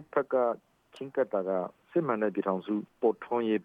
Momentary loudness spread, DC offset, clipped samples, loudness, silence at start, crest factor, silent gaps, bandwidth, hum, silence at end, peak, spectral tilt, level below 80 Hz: 6 LU; under 0.1%; under 0.1%; -31 LUFS; 0 s; 18 dB; none; 5.4 kHz; none; 0 s; -12 dBFS; -8.5 dB/octave; -80 dBFS